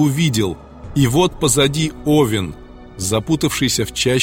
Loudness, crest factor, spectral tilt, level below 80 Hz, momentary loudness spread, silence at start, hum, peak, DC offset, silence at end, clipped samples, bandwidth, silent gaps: -17 LUFS; 16 dB; -4.5 dB/octave; -38 dBFS; 9 LU; 0 s; none; -2 dBFS; under 0.1%; 0 s; under 0.1%; 17 kHz; none